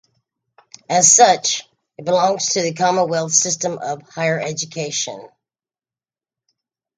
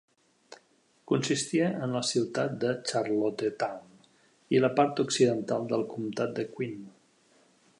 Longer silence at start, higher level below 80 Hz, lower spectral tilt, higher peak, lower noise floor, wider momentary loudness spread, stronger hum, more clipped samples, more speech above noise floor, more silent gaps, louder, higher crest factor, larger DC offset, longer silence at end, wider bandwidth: first, 0.9 s vs 0.5 s; first, -68 dBFS vs -76 dBFS; second, -2 dB/octave vs -5 dB/octave; first, 0 dBFS vs -10 dBFS; first, under -90 dBFS vs -66 dBFS; first, 15 LU vs 9 LU; neither; neither; first, over 73 dB vs 37 dB; neither; first, -16 LUFS vs -29 LUFS; about the same, 20 dB vs 20 dB; neither; first, 1.7 s vs 0.9 s; second, 10 kHz vs 11.5 kHz